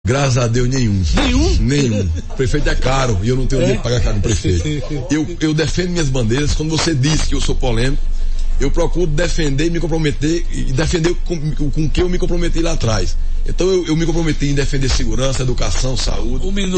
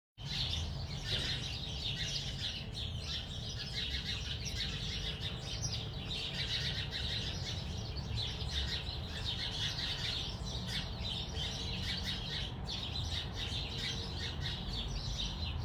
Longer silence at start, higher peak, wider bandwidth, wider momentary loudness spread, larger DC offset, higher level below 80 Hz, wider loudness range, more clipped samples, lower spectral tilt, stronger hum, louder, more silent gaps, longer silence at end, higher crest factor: about the same, 0.05 s vs 0.15 s; first, -4 dBFS vs -22 dBFS; second, 8.8 kHz vs 20 kHz; about the same, 6 LU vs 4 LU; neither; first, -18 dBFS vs -46 dBFS; about the same, 2 LU vs 1 LU; neither; first, -5.5 dB/octave vs -3.5 dB/octave; neither; first, -18 LUFS vs -38 LUFS; neither; about the same, 0 s vs 0 s; second, 10 dB vs 18 dB